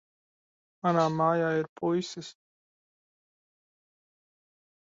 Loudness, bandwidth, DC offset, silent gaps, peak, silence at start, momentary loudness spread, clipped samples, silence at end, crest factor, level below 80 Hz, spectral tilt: -28 LUFS; 7.8 kHz; under 0.1%; 1.69-1.76 s; -12 dBFS; 0.85 s; 15 LU; under 0.1%; 2.65 s; 20 dB; -76 dBFS; -6.5 dB/octave